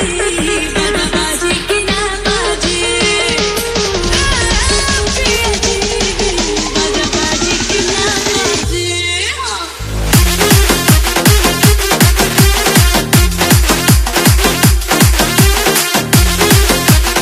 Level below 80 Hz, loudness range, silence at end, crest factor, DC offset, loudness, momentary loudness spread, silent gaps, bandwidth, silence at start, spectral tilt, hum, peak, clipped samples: -18 dBFS; 3 LU; 0 s; 12 dB; under 0.1%; -11 LUFS; 5 LU; none; over 20 kHz; 0 s; -3.5 dB/octave; none; 0 dBFS; 0.2%